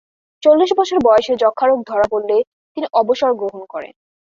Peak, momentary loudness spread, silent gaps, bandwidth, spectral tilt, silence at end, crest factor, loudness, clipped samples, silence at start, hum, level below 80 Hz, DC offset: -2 dBFS; 14 LU; 2.47-2.75 s; 7.4 kHz; -4.5 dB/octave; 0.45 s; 14 dB; -16 LUFS; under 0.1%; 0.4 s; none; -54 dBFS; under 0.1%